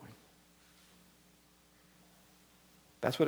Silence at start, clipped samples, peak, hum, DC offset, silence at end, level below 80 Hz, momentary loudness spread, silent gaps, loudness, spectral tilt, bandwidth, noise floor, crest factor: 0 s; under 0.1%; -14 dBFS; none; under 0.1%; 0 s; -76 dBFS; 18 LU; none; -40 LUFS; -5.5 dB/octave; over 20 kHz; -66 dBFS; 28 dB